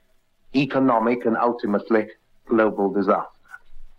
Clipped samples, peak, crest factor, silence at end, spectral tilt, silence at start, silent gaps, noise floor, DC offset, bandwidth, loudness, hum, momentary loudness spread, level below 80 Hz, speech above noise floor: under 0.1%; -4 dBFS; 18 dB; 0.1 s; -8 dB/octave; 0.5 s; none; -57 dBFS; under 0.1%; 6.8 kHz; -21 LUFS; none; 6 LU; -50 dBFS; 36 dB